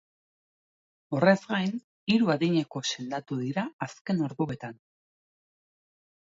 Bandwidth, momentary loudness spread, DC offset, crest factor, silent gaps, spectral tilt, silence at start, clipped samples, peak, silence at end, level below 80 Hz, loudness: 7.8 kHz; 12 LU; under 0.1%; 22 dB; 1.84-2.06 s, 3.73-3.79 s, 4.01-4.05 s; -5.5 dB/octave; 1.1 s; under 0.1%; -8 dBFS; 1.6 s; -70 dBFS; -28 LUFS